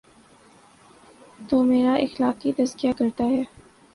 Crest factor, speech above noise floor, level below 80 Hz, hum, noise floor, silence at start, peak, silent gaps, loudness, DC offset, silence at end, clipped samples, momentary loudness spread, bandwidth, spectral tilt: 16 dB; 32 dB; -58 dBFS; none; -53 dBFS; 1.4 s; -8 dBFS; none; -23 LUFS; under 0.1%; 0.5 s; under 0.1%; 5 LU; 11.5 kHz; -5.5 dB/octave